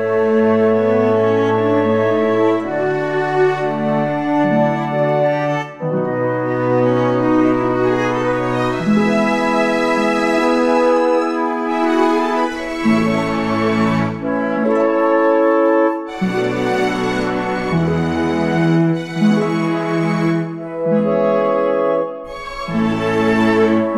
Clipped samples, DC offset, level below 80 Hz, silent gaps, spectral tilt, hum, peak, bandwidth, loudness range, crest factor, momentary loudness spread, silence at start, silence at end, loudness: under 0.1%; under 0.1%; -46 dBFS; none; -7 dB/octave; none; -2 dBFS; 12 kHz; 2 LU; 14 dB; 5 LU; 0 s; 0 s; -16 LUFS